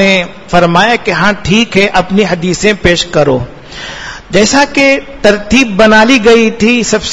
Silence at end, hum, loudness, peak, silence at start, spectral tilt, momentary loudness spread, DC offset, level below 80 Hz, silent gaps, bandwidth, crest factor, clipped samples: 0 s; none; -8 LUFS; 0 dBFS; 0 s; -4 dB/octave; 9 LU; under 0.1%; -32 dBFS; none; 11 kHz; 8 dB; 2%